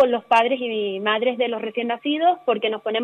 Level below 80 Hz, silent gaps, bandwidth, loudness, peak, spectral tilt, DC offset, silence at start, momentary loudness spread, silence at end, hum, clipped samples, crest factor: -76 dBFS; none; 10 kHz; -21 LUFS; -6 dBFS; -5 dB/octave; under 0.1%; 0 s; 7 LU; 0 s; none; under 0.1%; 16 dB